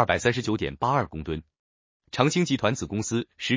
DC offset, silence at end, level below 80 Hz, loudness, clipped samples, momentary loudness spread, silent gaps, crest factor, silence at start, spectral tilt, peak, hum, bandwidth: under 0.1%; 0 s; -48 dBFS; -26 LUFS; under 0.1%; 11 LU; 1.59-2.00 s; 22 dB; 0 s; -5 dB/octave; -6 dBFS; none; 7.8 kHz